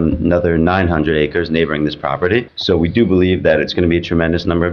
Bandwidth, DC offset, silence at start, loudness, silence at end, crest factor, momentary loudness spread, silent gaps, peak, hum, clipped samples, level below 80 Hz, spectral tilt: 6.6 kHz; under 0.1%; 0 s; -15 LUFS; 0 s; 12 dB; 4 LU; none; -2 dBFS; none; under 0.1%; -32 dBFS; -8 dB/octave